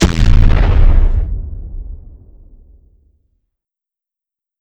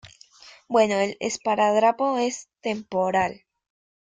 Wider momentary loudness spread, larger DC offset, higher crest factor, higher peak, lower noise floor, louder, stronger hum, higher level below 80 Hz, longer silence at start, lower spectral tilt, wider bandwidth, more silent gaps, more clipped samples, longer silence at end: first, 20 LU vs 9 LU; neither; about the same, 14 dB vs 18 dB; first, 0 dBFS vs -6 dBFS; first, -87 dBFS vs -50 dBFS; first, -14 LUFS vs -23 LUFS; neither; first, -14 dBFS vs -66 dBFS; about the same, 0 s vs 0.05 s; first, -6 dB/octave vs -4 dB/octave; second, 8 kHz vs 9.6 kHz; neither; first, 0.8% vs under 0.1%; first, 2.65 s vs 0.7 s